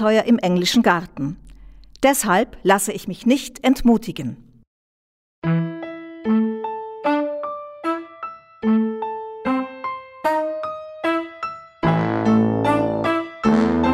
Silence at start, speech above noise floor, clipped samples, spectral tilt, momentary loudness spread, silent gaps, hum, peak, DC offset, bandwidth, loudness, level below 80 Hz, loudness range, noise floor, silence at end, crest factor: 0 s; 24 dB; under 0.1%; -5 dB/octave; 13 LU; 4.67-5.42 s; none; -2 dBFS; under 0.1%; 16 kHz; -21 LUFS; -46 dBFS; 5 LU; -42 dBFS; 0 s; 20 dB